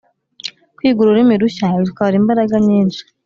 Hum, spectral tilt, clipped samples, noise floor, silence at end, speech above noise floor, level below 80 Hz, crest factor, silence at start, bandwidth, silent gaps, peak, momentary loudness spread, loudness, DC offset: none; -7.5 dB/octave; under 0.1%; -33 dBFS; 0.25 s; 20 dB; -54 dBFS; 12 dB; 0.45 s; 7.4 kHz; none; -2 dBFS; 17 LU; -14 LUFS; under 0.1%